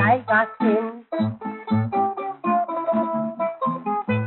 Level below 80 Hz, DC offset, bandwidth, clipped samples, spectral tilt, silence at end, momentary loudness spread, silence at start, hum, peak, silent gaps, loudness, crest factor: -70 dBFS; under 0.1%; 4.2 kHz; under 0.1%; -6 dB/octave; 0 s; 7 LU; 0 s; none; -6 dBFS; none; -23 LUFS; 16 dB